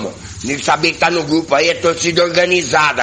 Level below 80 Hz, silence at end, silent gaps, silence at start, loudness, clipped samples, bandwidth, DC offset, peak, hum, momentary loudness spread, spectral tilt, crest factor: -48 dBFS; 0 s; none; 0 s; -14 LUFS; under 0.1%; 10 kHz; under 0.1%; 0 dBFS; none; 8 LU; -3 dB/octave; 14 dB